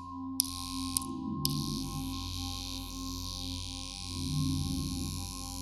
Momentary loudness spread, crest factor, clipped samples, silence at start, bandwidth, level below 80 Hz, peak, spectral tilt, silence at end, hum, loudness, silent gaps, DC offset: 7 LU; 30 dB; under 0.1%; 0 s; 18.5 kHz; -46 dBFS; -6 dBFS; -3.5 dB/octave; 0 s; none; -35 LUFS; none; under 0.1%